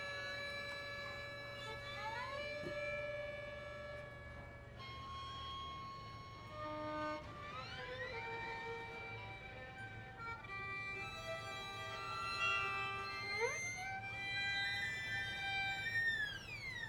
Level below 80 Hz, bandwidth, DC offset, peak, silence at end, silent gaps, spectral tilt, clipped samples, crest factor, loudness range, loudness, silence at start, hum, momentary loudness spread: -64 dBFS; 19 kHz; under 0.1%; -26 dBFS; 0 s; none; -3 dB/octave; under 0.1%; 20 dB; 8 LU; -43 LUFS; 0 s; none; 13 LU